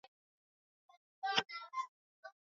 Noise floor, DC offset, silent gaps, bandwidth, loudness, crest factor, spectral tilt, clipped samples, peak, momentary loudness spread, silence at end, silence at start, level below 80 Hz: under -90 dBFS; under 0.1%; 1.89-2.23 s; 7.4 kHz; -40 LUFS; 30 dB; 1.5 dB/octave; under 0.1%; -16 dBFS; 22 LU; 0.25 s; 1.25 s; -88 dBFS